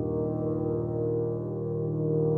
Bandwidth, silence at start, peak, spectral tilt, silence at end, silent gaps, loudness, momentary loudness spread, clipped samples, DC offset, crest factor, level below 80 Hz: 1.9 kHz; 0 s; -16 dBFS; -14 dB/octave; 0 s; none; -30 LUFS; 3 LU; under 0.1%; under 0.1%; 12 dB; -52 dBFS